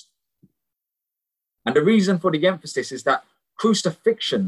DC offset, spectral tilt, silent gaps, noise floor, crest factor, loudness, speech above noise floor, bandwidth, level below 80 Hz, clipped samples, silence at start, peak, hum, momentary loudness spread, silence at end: under 0.1%; -5 dB/octave; none; -85 dBFS; 16 dB; -21 LUFS; 65 dB; 12 kHz; -68 dBFS; under 0.1%; 1.65 s; -6 dBFS; none; 8 LU; 0 s